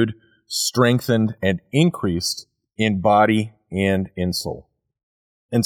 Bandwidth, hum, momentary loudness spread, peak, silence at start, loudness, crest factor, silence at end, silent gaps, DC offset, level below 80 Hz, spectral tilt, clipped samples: 18.5 kHz; none; 11 LU; -4 dBFS; 0 s; -20 LUFS; 18 dB; 0 s; 5.03-5.49 s; under 0.1%; -52 dBFS; -5 dB/octave; under 0.1%